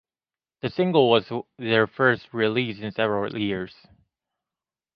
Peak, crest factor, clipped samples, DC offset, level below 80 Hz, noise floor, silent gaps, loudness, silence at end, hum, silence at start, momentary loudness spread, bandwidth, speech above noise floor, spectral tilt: -4 dBFS; 22 dB; under 0.1%; under 0.1%; -62 dBFS; under -90 dBFS; none; -24 LUFS; 1.25 s; none; 0.65 s; 12 LU; 5.8 kHz; over 67 dB; -8.5 dB/octave